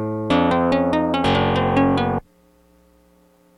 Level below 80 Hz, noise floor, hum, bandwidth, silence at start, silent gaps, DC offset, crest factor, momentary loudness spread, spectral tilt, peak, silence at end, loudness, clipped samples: -42 dBFS; -55 dBFS; none; 10.5 kHz; 0 s; none; under 0.1%; 14 dB; 4 LU; -7 dB/octave; -6 dBFS; 1.4 s; -19 LUFS; under 0.1%